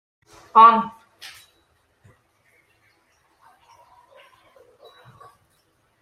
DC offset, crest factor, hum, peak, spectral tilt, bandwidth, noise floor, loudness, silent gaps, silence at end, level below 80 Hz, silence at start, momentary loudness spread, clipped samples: under 0.1%; 24 dB; none; -2 dBFS; -5 dB/octave; 13 kHz; -65 dBFS; -14 LUFS; none; 5.15 s; -74 dBFS; 0.55 s; 29 LU; under 0.1%